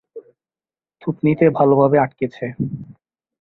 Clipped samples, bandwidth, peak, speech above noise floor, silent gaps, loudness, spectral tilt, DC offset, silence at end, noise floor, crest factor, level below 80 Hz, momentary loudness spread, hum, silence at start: under 0.1%; 4.6 kHz; -2 dBFS; over 74 dB; none; -18 LUFS; -11 dB/octave; under 0.1%; 0.5 s; under -90 dBFS; 18 dB; -56 dBFS; 14 LU; none; 0.15 s